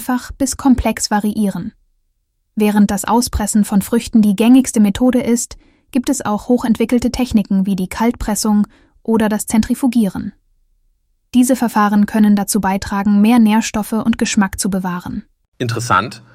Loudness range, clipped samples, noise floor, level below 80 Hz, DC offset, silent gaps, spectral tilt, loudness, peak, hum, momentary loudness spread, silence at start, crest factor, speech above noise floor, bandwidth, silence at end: 3 LU; under 0.1%; -65 dBFS; -36 dBFS; under 0.1%; 15.48-15.52 s; -5 dB/octave; -15 LUFS; -2 dBFS; none; 10 LU; 0 s; 14 dB; 51 dB; 15.5 kHz; 0.15 s